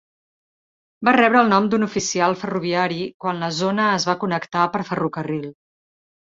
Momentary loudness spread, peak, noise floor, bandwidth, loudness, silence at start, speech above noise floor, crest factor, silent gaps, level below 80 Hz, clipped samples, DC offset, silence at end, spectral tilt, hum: 11 LU; -2 dBFS; under -90 dBFS; 7.8 kHz; -20 LUFS; 1 s; over 70 dB; 20 dB; 3.14-3.20 s; -62 dBFS; under 0.1%; under 0.1%; 0.9 s; -4.5 dB/octave; none